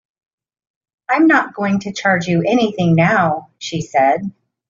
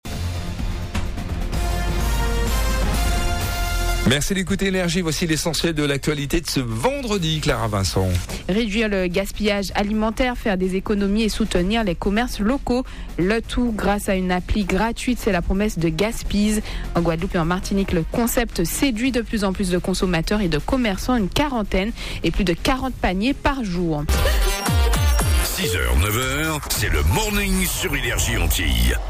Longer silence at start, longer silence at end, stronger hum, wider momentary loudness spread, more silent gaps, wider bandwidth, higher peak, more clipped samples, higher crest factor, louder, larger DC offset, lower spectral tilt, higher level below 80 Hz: first, 1.1 s vs 0.05 s; first, 0.4 s vs 0 s; neither; first, 12 LU vs 4 LU; neither; second, 7.6 kHz vs 15.5 kHz; first, -2 dBFS vs -10 dBFS; neither; about the same, 14 dB vs 12 dB; first, -16 LUFS vs -21 LUFS; neither; about the same, -5 dB/octave vs -4.5 dB/octave; second, -56 dBFS vs -26 dBFS